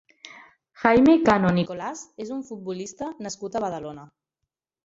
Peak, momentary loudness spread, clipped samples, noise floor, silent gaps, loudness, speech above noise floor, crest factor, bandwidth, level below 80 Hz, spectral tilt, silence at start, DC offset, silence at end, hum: -4 dBFS; 20 LU; under 0.1%; -84 dBFS; none; -23 LUFS; 61 dB; 20 dB; 7.8 kHz; -56 dBFS; -6 dB/octave; 0.25 s; under 0.1%; 0.8 s; none